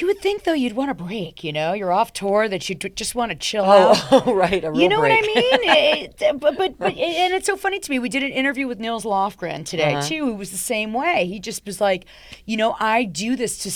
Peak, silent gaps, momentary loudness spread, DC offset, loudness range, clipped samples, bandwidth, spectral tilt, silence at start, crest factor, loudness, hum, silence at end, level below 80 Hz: -2 dBFS; none; 11 LU; under 0.1%; 7 LU; under 0.1%; 20 kHz; -3.5 dB/octave; 0 s; 18 dB; -20 LUFS; none; 0 s; -52 dBFS